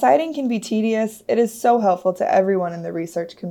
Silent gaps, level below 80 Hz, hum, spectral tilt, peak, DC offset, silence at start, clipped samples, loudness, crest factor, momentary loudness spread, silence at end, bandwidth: none; -70 dBFS; none; -6 dB/octave; -4 dBFS; under 0.1%; 0 s; under 0.1%; -20 LUFS; 16 dB; 9 LU; 0 s; 17.5 kHz